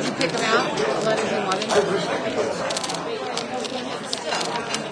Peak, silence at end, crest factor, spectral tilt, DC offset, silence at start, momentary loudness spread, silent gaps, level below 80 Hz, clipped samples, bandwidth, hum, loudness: -4 dBFS; 0 s; 20 dB; -3 dB/octave; under 0.1%; 0 s; 7 LU; none; -62 dBFS; under 0.1%; 11 kHz; none; -23 LUFS